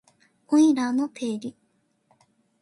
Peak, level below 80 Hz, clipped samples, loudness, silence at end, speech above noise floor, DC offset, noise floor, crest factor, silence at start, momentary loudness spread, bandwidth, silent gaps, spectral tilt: -10 dBFS; -76 dBFS; under 0.1%; -23 LUFS; 1.1 s; 47 dB; under 0.1%; -69 dBFS; 16 dB; 0.5 s; 14 LU; 11.5 kHz; none; -4.5 dB/octave